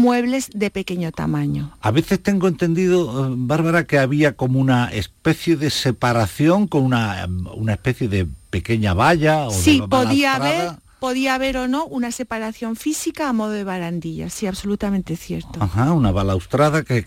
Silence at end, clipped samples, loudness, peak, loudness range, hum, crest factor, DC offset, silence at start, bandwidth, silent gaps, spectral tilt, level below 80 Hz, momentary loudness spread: 0 s; under 0.1%; -19 LUFS; -4 dBFS; 6 LU; none; 14 dB; under 0.1%; 0 s; 17 kHz; none; -6 dB/octave; -40 dBFS; 9 LU